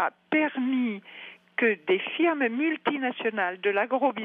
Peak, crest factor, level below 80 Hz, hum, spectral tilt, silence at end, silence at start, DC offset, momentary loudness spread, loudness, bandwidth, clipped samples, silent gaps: -10 dBFS; 16 dB; -86 dBFS; none; -7.5 dB/octave; 0 s; 0 s; under 0.1%; 8 LU; -26 LUFS; 4 kHz; under 0.1%; none